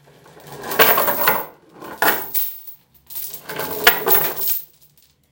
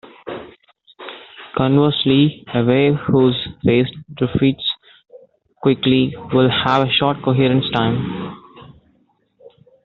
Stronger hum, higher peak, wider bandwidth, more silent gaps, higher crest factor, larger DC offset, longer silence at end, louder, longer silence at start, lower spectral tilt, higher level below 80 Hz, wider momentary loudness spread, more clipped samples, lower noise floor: neither; about the same, 0 dBFS vs -2 dBFS; first, 18 kHz vs 5.8 kHz; neither; about the same, 20 dB vs 16 dB; neither; second, 0.65 s vs 1.15 s; about the same, -17 LUFS vs -17 LUFS; first, 0.45 s vs 0.05 s; second, -1.5 dB/octave vs -5 dB/octave; second, -58 dBFS vs -50 dBFS; first, 21 LU vs 17 LU; neither; second, -54 dBFS vs -61 dBFS